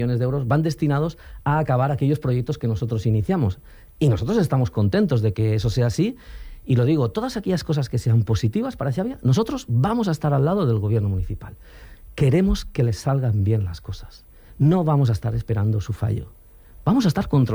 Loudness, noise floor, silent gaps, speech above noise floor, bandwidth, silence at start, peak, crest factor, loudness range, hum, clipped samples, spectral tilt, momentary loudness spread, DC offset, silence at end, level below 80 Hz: -22 LUFS; -46 dBFS; none; 25 dB; 19.5 kHz; 0 s; -8 dBFS; 14 dB; 2 LU; none; under 0.1%; -8 dB/octave; 8 LU; under 0.1%; 0 s; -40 dBFS